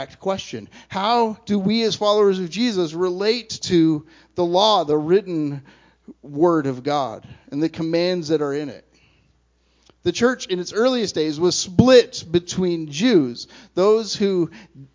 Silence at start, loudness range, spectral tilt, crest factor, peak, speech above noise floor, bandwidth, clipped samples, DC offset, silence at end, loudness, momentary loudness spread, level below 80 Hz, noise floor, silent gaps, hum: 0 s; 6 LU; -5 dB/octave; 20 dB; 0 dBFS; 42 dB; 7.6 kHz; under 0.1%; under 0.1%; 0.1 s; -20 LUFS; 11 LU; -52 dBFS; -62 dBFS; none; none